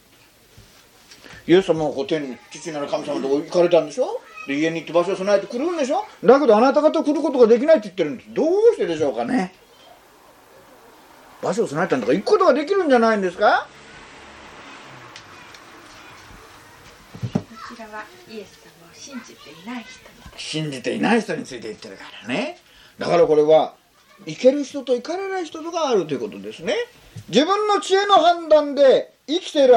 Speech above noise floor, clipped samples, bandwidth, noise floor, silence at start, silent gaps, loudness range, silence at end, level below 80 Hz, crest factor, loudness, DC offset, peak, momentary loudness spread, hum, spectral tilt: 34 dB; under 0.1%; 11 kHz; -53 dBFS; 1.3 s; none; 17 LU; 0 s; -60 dBFS; 20 dB; -19 LUFS; under 0.1%; 0 dBFS; 23 LU; none; -5 dB/octave